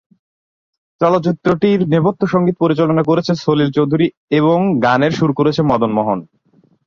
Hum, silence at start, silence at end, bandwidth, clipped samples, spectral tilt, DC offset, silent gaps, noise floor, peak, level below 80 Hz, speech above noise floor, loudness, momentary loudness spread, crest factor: none; 1 s; 0.65 s; 7.2 kHz; under 0.1%; -8 dB/octave; under 0.1%; 4.17-4.28 s; under -90 dBFS; 0 dBFS; -52 dBFS; over 76 dB; -15 LUFS; 3 LU; 14 dB